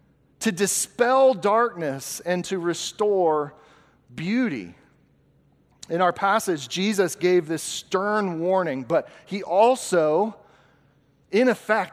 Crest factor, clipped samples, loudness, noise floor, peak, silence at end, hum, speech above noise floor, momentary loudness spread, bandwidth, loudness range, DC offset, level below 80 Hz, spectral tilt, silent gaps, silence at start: 18 dB; under 0.1%; -23 LUFS; -61 dBFS; -6 dBFS; 0 s; none; 38 dB; 10 LU; 16 kHz; 4 LU; under 0.1%; -68 dBFS; -4 dB/octave; none; 0.4 s